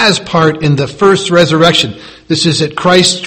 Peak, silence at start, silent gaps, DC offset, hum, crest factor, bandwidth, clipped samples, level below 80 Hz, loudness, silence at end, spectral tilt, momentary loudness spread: 0 dBFS; 0 s; none; under 0.1%; none; 10 dB; 14.5 kHz; 0.8%; -42 dBFS; -10 LUFS; 0 s; -4.5 dB/octave; 6 LU